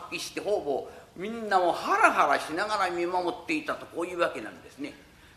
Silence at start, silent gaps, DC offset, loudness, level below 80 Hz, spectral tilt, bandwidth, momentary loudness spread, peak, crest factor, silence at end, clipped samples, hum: 0 s; none; under 0.1%; -27 LUFS; -64 dBFS; -3.5 dB/octave; 14 kHz; 18 LU; -4 dBFS; 24 dB; 0.35 s; under 0.1%; none